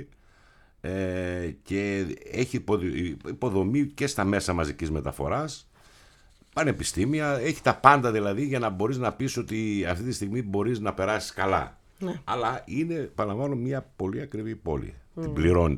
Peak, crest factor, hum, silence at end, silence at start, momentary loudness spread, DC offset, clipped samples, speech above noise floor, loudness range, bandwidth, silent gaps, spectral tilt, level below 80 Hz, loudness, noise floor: 0 dBFS; 28 dB; none; 0 s; 0 s; 8 LU; under 0.1%; under 0.1%; 31 dB; 6 LU; 15.5 kHz; none; -6 dB/octave; -46 dBFS; -28 LUFS; -58 dBFS